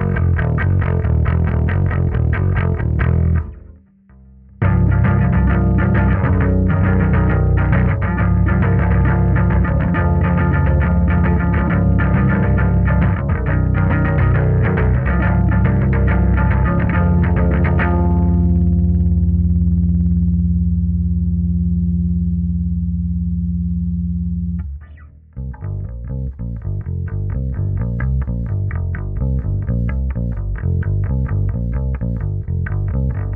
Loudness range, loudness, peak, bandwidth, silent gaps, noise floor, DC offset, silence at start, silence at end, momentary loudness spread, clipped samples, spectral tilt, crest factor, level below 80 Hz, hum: 7 LU; -17 LUFS; -4 dBFS; 3.3 kHz; none; -46 dBFS; under 0.1%; 0 s; 0 s; 7 LU; under 0.1%; -12 dB/octave; 12 dB; -20 dBFS; none